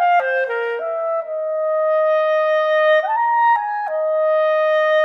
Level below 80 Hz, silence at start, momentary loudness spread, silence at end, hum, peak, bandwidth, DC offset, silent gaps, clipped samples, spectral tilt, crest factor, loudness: -76 dBFS; 0 s; 7 LU; 0 s; none; -6 dBFS; 6 kHz; under 0.1%; none; under 0.1%; -0.5 dB/octave; 10 dB; -18 LUFS